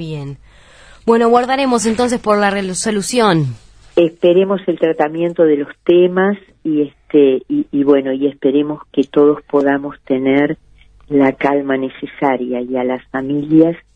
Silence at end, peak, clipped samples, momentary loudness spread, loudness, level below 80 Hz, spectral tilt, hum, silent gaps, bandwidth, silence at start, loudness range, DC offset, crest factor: 0.15 s; 0 dBFS; under 0.1%; 8 LU; -15 LUFS; -50 dBFS; -5.5 dB/octave; none; none; 11 kHz; 0 s; 2 LU; under 0.1%; 14 dB